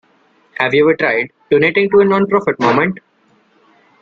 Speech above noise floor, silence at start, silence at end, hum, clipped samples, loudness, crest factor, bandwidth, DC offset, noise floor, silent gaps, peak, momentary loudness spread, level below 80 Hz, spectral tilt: 42 dB; 0.6 s; 1.05 s; none; under 0.1%; -13 LUFS; 14 dB; 7 kHz; under 0.1%; -55 dBFS; none; -2 dBFS; 8 LU; -56 dBFS; -7 dB/octave